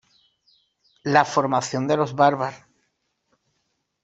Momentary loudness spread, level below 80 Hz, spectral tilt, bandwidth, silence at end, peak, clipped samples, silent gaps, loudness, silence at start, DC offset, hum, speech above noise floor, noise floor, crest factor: 10 LU; -66 dBFS; -5 dB/octave; 8.2 kHz; 1.45 s; -2 dBFS; under 0.1%; none; -21 LUFS; 1.05 s; under 0.1%; none; 53 dB; -74 dBFS; 22 dB